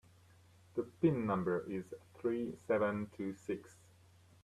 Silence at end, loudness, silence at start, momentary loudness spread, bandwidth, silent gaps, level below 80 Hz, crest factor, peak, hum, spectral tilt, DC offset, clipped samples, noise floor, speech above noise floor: 0.7 s; -38 LUFS; 0.75 s; 10 LU; 13 kHz; none; -74 dBFS; 20 dB; -20 dBFS; none; -8.5 dB/octave; under 0.1%; under 0.1%; -64 dBFS; 27 dB